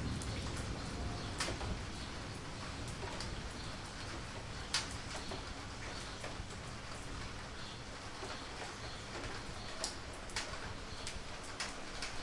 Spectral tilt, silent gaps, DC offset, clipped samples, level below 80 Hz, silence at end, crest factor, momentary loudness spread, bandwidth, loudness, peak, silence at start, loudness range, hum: -3.5 dB/octave; none; under 0.1%; under 0.1%; -50 dBFS; 0 s; 22 dB; 7 LU; 11.5 kHz; -43 LUFS; -20 dBFS; 0 s; 3 LU; none